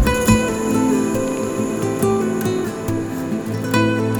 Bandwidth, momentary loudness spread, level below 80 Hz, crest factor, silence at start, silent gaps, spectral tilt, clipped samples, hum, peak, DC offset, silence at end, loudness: over 20 kHz; 7 LU; -34 dBFS; 16 dB; 0 s; none; -5.5 dB/octave; under 0.1%; none; -2 dBFS; under 0.1%; 0 s; -19 LUFS